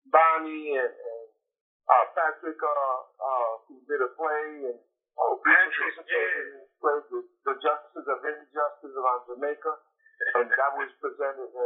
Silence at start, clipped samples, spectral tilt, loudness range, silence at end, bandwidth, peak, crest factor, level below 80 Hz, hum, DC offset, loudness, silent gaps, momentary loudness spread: 0.15 s; under 0.1%; 2.5 dB/octave; 4 LU; 0 s; 4 kHz; -6 dBFS; 22 dB; under -90 dBFS; none; under 0.1%; -27 LUFS; 1.61-1.80 s; 15 LU